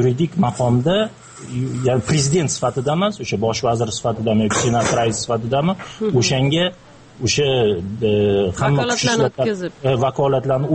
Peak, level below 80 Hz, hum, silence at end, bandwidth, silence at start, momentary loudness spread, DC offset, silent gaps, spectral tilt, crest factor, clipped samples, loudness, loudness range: -4 dBFS; -46 dBFS; none; 0 s; 8.8 kHz; 0 s; 5 LU; under 0.1%; none; -5 dB/octave; 14 dB; under 0.1%; -18 LUFS; 1 LU